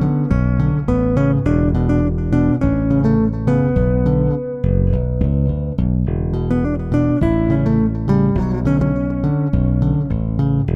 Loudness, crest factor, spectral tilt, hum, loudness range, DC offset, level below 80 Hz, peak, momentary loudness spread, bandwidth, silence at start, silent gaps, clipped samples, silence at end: -17 LUFS; 12 dB; -10.5 dB/octave; none; 2 LU; under 0.1%; -24 dBFS; -4 dBFS; 3 LU; 6 kHz; 0 s; none; under 0.1%; 0 s